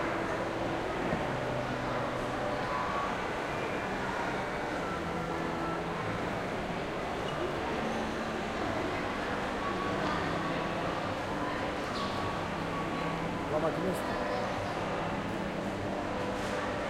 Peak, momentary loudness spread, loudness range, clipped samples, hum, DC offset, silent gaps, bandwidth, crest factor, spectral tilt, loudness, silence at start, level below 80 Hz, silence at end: -18 dBFS; 2 LU; 1 LU; under 0.1%; none; under 0.1%; none; 16.5 kHz; 16 dB; -5.5 dB/octave; -34 LUFS; 0 s; -52 dBFS; 0 s